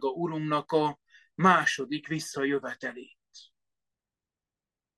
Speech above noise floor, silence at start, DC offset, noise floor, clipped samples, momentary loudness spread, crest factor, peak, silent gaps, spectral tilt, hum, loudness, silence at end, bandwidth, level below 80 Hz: over 62 dB; 0 s; under 0.1%; under -90 dBFS; under 0.1%; 17 LU; 24 dB; -6 dBFS; none; -5 dB/octave; none; -28 LUFS; 1.55 s; 12.5 kHz; -74 dBFS